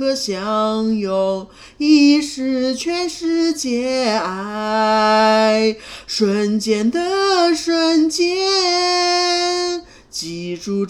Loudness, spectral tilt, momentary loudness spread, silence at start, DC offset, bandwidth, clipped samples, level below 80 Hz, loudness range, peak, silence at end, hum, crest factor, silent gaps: -17 LUFS; -3.5 dB/octave; 11 LU; 0 s; under 0.1%; 13 kHz; under 0.1%; -54 dBFS; 2 LU; -2 dBFS; 0 s; none; 14 dB; none